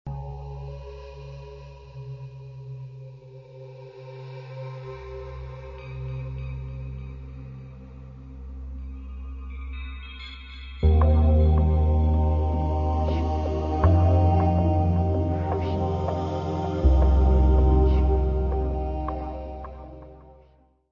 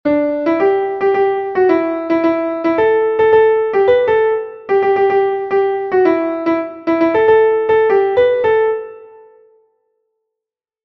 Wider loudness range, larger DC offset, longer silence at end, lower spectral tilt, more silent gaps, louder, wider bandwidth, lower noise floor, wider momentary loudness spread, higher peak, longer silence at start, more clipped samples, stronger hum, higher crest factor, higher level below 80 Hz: first, 17 LU vs 2 LU; neither; second, 0.6 s vs 1.8 s; first, -10 dB/octave vs -7.5 dB/octave; neither; second, -23 LUFS vs -14 LUFS; about the same, 5.6 kHz vs 5.8 kHz; second, -58 dBFS vs -84 dBFS; first, 22 LU vs 6 LU; second, -8 dBFS vs 0 dBFS; about the same, 0.05 s vs 0.05 s; neither; neither; about the same, 16 dB vs 14 dB; first, -28 dBFS vs -54 dBFS